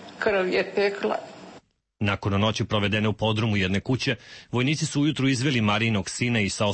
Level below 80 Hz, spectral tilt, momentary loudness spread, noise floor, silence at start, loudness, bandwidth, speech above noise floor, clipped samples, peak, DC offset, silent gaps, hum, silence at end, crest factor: -54 dBFS; -5 dB/octave; 6 LU; -52 dBFS; 0 s; -24 LUFS; 8.8 kHz; 28 dB; under 0.1%; -10 dBFS; under 0.1%; none; none; 0 s; 14 dB